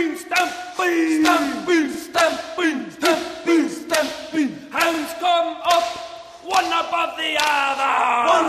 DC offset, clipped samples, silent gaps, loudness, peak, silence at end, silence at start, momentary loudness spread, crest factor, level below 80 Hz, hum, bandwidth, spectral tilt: under 0.1%; under 0.1%; none; -20 LUFS; 0 dBFS; 0 s; 0 s; 6 LU; 20 dB; -60 dBFS; none; 15 kHz; -2 dB/octave